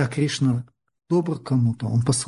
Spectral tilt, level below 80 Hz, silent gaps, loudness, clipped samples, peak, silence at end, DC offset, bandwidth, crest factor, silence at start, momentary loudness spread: -6 dB/octave; -54 dBFS; none; -23 LUFS; under 0.1%; -8 dBFS; 0 s; under 0.1%; 11 kHz; 14 dB; 0 s; 3 LU